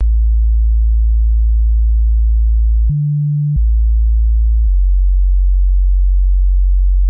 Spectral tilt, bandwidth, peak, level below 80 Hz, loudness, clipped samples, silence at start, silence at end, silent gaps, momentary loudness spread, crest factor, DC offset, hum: -16.5 dB/octave; 0.2 kHz; -6 dBFS; -10 dBFS; -15 LUFS; under 0.1%; 0 s; 0 s; none; 1 LU; 4 dB; under 0.1%; none